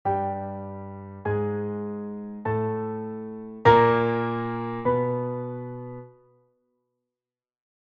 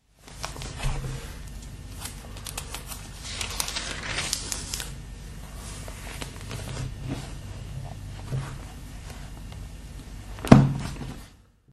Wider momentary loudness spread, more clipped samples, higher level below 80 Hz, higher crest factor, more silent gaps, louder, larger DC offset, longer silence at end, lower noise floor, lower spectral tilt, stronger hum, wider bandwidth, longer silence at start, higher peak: first, 19 LU vs 14 LU; neither; second, -56 dBFS vs -40 dBFS; second, 24 dB vs 30 dB; neither; first, -26 LUFS vs -29 LUFS; neither; first, 1.75 s vs 0.3 s; first, under -90 dBFS vs -52 dBFS; first, -8.5 dB/octave vs -5 dB/octave; neither; second, 6.8 kHz vs 13.5 kHz; second, 0.05 s vs 0.25 s; second, -4 dBFS vs 0 dBFS